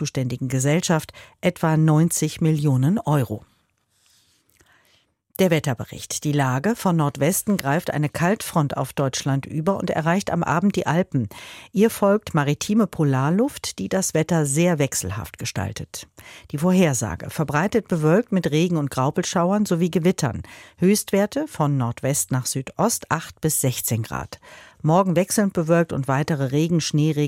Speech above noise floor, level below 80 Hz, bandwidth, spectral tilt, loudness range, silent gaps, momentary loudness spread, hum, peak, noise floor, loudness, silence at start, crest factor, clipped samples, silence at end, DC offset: 45 dB; -52 dBFS; 16.5 kHz; -5.5 dB/octave; 3 LU; none; 9 LU; none; -4 dBFS; -66 dBFS; -22 LUFS; 0 s; 18 dB; under 0.1%; 0 s; under 0.1%